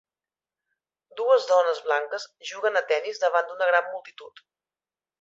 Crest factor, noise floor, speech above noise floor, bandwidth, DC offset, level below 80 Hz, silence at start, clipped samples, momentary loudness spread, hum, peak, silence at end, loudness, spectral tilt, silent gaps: 20 dB; under -90 dBFS; over 65 dB; 7.8 kHz; under 0.1%; -84 dBFS; 1.15 s; under 0.1%; 15 LU; none; -6 dBFS; 0.9 s; -24 LUFS; 0.5 dB/octave; none